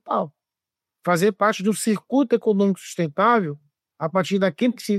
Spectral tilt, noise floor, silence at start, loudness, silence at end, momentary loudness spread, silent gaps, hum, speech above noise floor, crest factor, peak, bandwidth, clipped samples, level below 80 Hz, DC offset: -5.5 dB/octave; -87 dBFS; 0.05 s; -22 LUFS; 0 s; 12 LU; none; none; 67 dB; 16 dB; -6 dBFS; 15 kHz; under 0.1%; -74 dBFS; under 0.1%